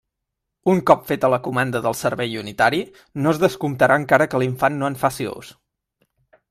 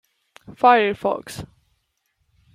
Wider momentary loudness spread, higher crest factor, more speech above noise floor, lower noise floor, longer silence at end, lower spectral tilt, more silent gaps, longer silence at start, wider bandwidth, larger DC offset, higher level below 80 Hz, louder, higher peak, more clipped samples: second, 10 LU vs 21 LU; about the same, 20 dB vs 20 dB; first, 61 dB vs 52 dB; first, -81 dBFS vs -71 dBFS; about the same, 1 s vs 1.1 s; about the same, -5.5 dB/octave vs -4.5 dB/octave; neither; first, 0.65 s vs 0.5 s; about the same, 16 kHz vs 15.5 kHz; neither; about the same, -56 dBFS vs -56 dBFS; about the same, -20 LUFS vs -19 LUFS; about the same, 0 dBFS vs -2 dBFS; neither